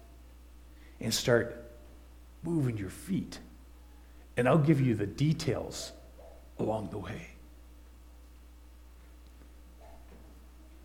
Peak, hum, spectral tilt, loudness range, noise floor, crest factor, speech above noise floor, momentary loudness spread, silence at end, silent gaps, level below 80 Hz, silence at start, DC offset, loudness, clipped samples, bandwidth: -10 dBFS; none; -6 dB/octave; 11 LU; -53 dBFS; 24 dB; 23 dB; 27 LU; 0 s; none; -52 dBFS; 0 s; under 0.1%; -31 LUFS; under 0.1%; 16.5 kHz